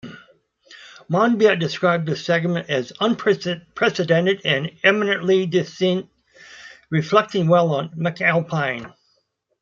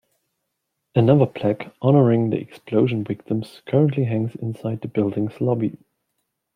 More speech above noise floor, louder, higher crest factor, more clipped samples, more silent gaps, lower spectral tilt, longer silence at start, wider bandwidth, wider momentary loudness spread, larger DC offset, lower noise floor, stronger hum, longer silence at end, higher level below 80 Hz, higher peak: second, 49 dB vs 57 dB; about the same, -20 LUFS vs -21 LUFS; about the same, 18 dB vs 20 dB; neither; neither; second, -6 dB/octave vs -10 dB/octave; second, 0.05 s vs 0.95 s; second, 7.4 kHz vs 9.6 kHz; second, 8 LU vs 11 LU; neither; second, -68 dBFS vs -77 dBFS; neither; about the same, 0.75 s vs 0.8 s; about the same, -64 dBFS vs -62 dBFS; about the same, -2 dBFS vs -2 dBFS